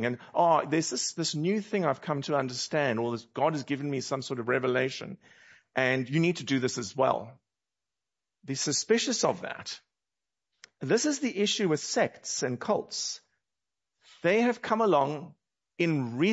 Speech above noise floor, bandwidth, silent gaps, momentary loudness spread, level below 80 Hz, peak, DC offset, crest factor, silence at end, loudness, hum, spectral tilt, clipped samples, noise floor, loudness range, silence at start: over 61 dB; 8.2 kHz; none; 10 LU; -76 dBFS; -8 dBFS; under 0.1%; 20 dB; 0 s; -29 LUFS; none; -4 dB/octave; under 0.1%; under -90 dBFS; 2 LU; 0 s